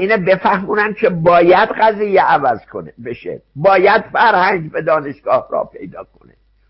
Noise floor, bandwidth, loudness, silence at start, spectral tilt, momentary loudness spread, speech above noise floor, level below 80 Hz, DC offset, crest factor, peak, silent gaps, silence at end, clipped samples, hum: -50 dBFS; 5.8 kHz; -13 LUFS; 0 s; -11 dB/octave; 17 LU; 36 dB; -50 dBFS; under 0.1%; 14 dB; 0 dBFS; none; 0.65 s; under 0.1%; none